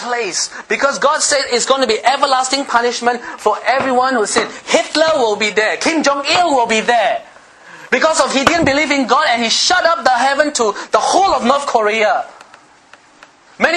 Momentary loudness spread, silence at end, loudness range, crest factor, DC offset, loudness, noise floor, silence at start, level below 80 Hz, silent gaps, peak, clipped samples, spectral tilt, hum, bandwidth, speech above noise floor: 5 LU; 0 s; 2 LU; 14 dB; under 0.1%; -14 LUFS; -45 dBFS; 0 s; -50 dBFS; none; 0 dBFS; under 0.1%; -1.5 dB/octave; none; 12.5 kHz; 31 dB